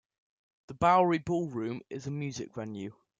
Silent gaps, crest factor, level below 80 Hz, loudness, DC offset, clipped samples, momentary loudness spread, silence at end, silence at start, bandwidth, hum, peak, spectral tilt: none; 20 dB; -64 dBFS; -30 LUFS; under 0.1%; under 0.1%; 15 LU; 0.3 s; 0.7 s; 9 kHz; none; -12 dBFS; -6.5 dB/octave